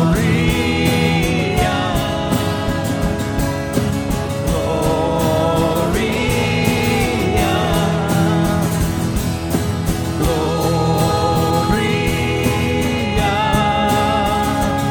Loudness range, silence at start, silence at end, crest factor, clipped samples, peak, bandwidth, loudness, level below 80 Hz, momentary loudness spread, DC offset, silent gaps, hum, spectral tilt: 2 LU; 0 s; 0 s; 16 dB; under 0.1%; 0 dBFS; 19.5 kHz; -17 LUFS; -28 dBFS; 4 LU; under 0.1%; none; none; -5.5 dB/octave